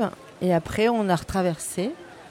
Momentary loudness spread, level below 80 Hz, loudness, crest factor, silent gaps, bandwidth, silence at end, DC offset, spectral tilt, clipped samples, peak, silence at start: 8 LU; -48 dBFS; -25 LUFS; 16 dB; none; 16.5 kHz; 0 s; under 0.1%; -5.5 dB/octave; under 0.1%; -10 dBFS; 0 s